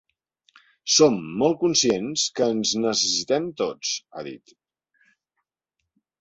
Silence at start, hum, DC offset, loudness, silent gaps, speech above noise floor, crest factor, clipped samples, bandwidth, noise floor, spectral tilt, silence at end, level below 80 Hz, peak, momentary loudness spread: 0.85 s; none; under 0.1%; -22 LUFS; none; 59 dB; 20 dB; under 0.1%; 8.2 kHz; -81 dBFS; -3 dB/octave; 1.85 s; -64 dBFS; -4 dBFS; 14 LU